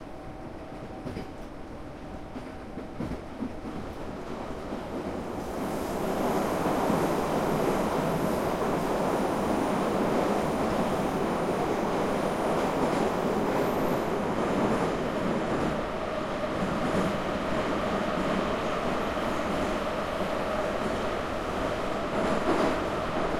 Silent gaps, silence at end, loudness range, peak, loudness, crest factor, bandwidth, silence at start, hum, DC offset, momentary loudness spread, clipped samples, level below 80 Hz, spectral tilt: none; 0 s; 10 LU; -12 dBFS; -29 LUFS; 16 dB; 16.5 kHz; 0 s; none; under 0.1%; 12 LU; under 0.1%; -46 dBFS; -6 dB/octave